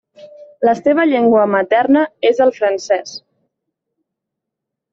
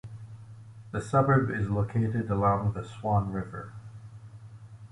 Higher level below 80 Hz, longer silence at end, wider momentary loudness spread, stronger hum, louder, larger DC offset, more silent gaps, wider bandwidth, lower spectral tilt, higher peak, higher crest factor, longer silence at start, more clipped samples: second, -62 dBFS vs -50 dBFS; first, 1.75 s vs 0.05 s; second, 7 LU vs 23 LU; neither; first, -14 LUFS vs -28 LUFS; neither; neither; second, 7.6 kHz vs 11 kHz; second, -5 dB/octave vs -8.5 dB/octave; first, -2 dBFS vs -10 dBFS; about the same, 14 dB vs 18 dB; first, 0.25 s vs 0.05 s; neither